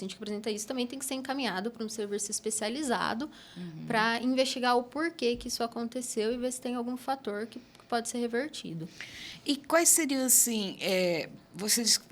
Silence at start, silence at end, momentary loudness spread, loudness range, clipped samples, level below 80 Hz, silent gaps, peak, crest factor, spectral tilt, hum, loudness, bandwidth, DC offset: 0 s; 0.05 s; 17 LU; 7 LU; under 0.1%; -66 dBFS; none; -8 dBFS; 22 dB; -2 dB/octave; none; -29 LUFS; over 20 kHz; under 0.1%